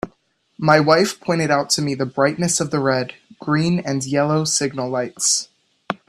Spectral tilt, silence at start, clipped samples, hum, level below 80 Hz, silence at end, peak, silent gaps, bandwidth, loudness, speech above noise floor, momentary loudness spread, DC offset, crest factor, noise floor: -4 dB/octave; 0.05 s; under 0.1%; none; -58 dBFS; 0.15 s; 0 dBFS; none; 14 kHz; -19 LUFS; 44 dB; 8 LU; under 0.1%; 20 dB; -62 dBFS